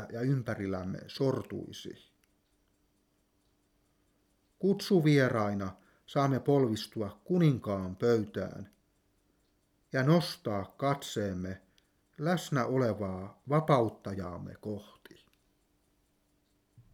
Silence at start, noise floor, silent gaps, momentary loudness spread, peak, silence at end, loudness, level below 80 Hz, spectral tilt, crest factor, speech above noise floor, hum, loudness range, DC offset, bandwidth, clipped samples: 0 s; -73 dBFS; none; 15 LU; -12 dBFS; 2.1 s; -31 LUFS; -70 dBFS; -7 dB/octave; 20 dB; 43 dB; none; 9 LU; under 0.1%; 16.5 kHz; under 0.1%